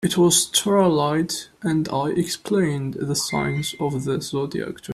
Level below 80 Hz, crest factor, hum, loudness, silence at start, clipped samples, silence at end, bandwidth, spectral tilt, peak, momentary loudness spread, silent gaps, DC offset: -54 dBFS; 16 dB; none; -22 LUFS; 0 s; under 0.1%; 0 s; 15 kHz; -4 dB/octave; -4 dBFS; 10 LU; none; under 0.1%